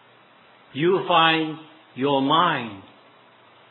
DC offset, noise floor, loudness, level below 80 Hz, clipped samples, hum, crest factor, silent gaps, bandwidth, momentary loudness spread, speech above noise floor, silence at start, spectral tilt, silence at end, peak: under 0.1%; -53 dBFS; -21 LUFS; -82 dBFS; under 0.1%; none; 20 dB; none; 4.3 kHz; 20 LU; 32 dB; 0.75 s; -8.5 dB/octave; 0.9 s; -4 dBFS